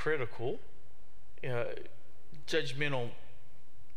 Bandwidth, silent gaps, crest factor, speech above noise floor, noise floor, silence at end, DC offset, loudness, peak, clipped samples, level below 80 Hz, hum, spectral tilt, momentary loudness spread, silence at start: 15.5 kHz; none; 22 dB; 27 dB; -63 dBFS; 0.6 s; 3%; -37 LUFS; -16 dBFS; under 0.1%; -66 dBFS; none; -5 dB/octave; 19 LU; 0 s